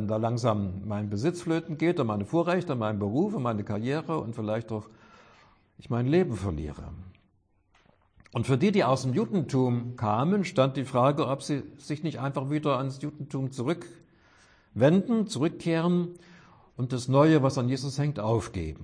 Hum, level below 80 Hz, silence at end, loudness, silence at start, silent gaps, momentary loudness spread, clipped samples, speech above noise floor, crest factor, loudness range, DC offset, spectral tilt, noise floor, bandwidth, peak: none; -54 dBFS; 0 s; -28 LUFS; 0 s; none; 12 LU; under 0.1%; 41 dB; 18 dB; 6 LU; under 0.1%; -7 dB/octave; -68 dBFS; 10.5 kHz; -10 dBFS